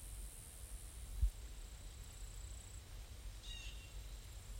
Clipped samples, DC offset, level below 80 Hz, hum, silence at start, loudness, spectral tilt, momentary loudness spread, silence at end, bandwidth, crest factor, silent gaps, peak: under 0.1%; under 0.1%; -48 dBFS; none; 0 s; -51 LUFS; -3 dB/octave; 11 LU; 0 s; 16.5 kHz; 22 dB; none; -26 dBFS